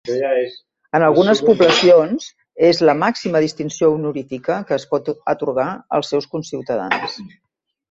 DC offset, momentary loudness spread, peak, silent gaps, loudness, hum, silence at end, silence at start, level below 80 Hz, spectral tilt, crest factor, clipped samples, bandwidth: under 0.1%; 13 LU; -2 dBFS; none; -17 LUFS; none; 0.65 s; 0.05 s; -60 dBFS; -5 dB/octave; 16 dB; under 0.1%; 7.8 kHz